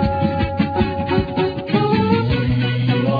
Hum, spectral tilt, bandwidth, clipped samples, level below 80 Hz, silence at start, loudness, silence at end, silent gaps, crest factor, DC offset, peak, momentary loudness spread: none; -9.5 dB/octave; 5 kHz; under 0.1%; -34 dBFS; 0 s; -19 LUFS; 0 s; none; 14 dB; under 0.1%; -4 dBFS; 3 LU